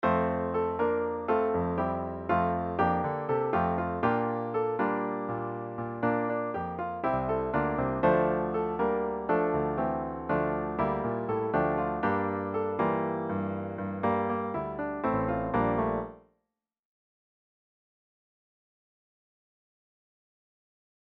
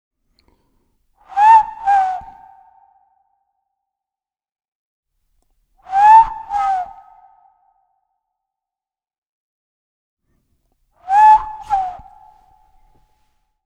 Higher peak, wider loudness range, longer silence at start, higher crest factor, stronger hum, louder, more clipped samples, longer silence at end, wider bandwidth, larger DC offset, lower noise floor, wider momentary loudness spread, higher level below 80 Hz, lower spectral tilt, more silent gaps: second, -12 dBFS vs 0 dBFS; second, 4 LU vs 9 LU; second, 0 s vs 1.35 s; about the same, 18 dB vs 20 dB; neither; second, -30 LUFS vs -13 LUFS; neither; first, 4.85 s vs 1.7 s; second, 5.4 kHz vs 8.4 kHz; neither; second, -83 dBFS vs under -90 dBFS; second, 6 LU vs 16 LU; about the same, -52 dBFS vs -50 dBFS; first, -10.5 dB/octave vs -2 dB/octave; second, none vs 4.68-5.03 s, 9.18-9.22 s, 9.29-10.17 s